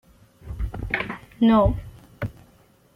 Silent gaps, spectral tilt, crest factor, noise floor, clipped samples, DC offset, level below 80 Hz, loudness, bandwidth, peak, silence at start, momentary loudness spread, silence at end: none; -8.5 dB/octave; 18 dB; -56 dBFS; under 0.1%; under 0.1%; -36 dBFS; -24 LUFS; 5.4 kHz; -8 dBFS; 0.45 s; 17 LU; 0.65 s